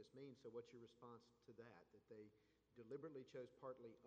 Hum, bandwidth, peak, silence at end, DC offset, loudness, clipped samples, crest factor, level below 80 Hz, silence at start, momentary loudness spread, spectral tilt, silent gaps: none; 8.4 kHz; -42 dBFS; 0 s; under 0.1%; -61 LUFS; under 0.1%; 18 dB; under -90 dBFS; 0 s; 10 LU; -6.5 dB/octave; none